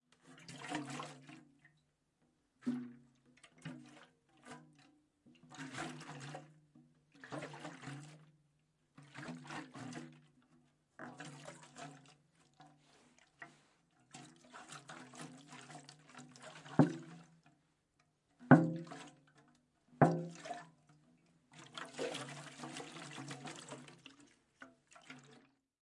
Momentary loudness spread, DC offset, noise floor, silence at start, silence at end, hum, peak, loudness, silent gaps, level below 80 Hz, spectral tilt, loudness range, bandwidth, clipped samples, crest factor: 25 LU; under 0.1%; -79 dBFS; 0.25 s; 0.5 s; none; -10 dBFS; -40 LUFS; none; -82 dBFS; -6.5 dB/octave; 20 LU; 11.5 kHz; under 0.1%; 34 dB